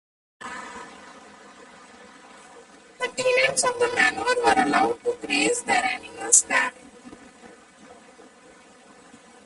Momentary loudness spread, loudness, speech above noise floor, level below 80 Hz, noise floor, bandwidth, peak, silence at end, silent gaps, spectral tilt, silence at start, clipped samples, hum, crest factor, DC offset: 20 LU; -21 LUFS; 29 dB; -62 dBFS; -51 dBFS; 11.5 kHz; -2 dBFS; 1.5 s; none; -1 dB/octave; 0.4 s; under 0.1%; none; 24 dB; under 0.1%